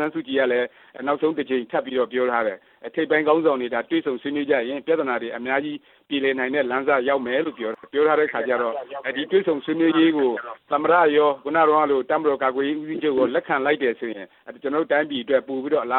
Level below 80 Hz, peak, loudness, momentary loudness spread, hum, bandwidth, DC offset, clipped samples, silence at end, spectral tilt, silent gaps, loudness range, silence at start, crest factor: -70 dBFS; -4 dBFS; -22 LUFS; 10 LU; none; 4.2 kHz; under 0.1%; under 0.1%; 0 s; -8.5 dB/octave; none; 4 LU; 0 s; 16 dB